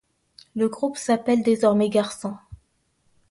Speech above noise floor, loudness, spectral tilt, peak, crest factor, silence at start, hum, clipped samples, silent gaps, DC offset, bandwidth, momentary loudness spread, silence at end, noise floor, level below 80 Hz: 46 dB; -22 LUFS; -5.5 dB/octave; -6 dBFS; 18 dB; 0.55 s; none; under 0.1%; none; under 0.1%; 11.5 kHz; 15 LU; 0.75 s; -67 dBFS; -58 dBFS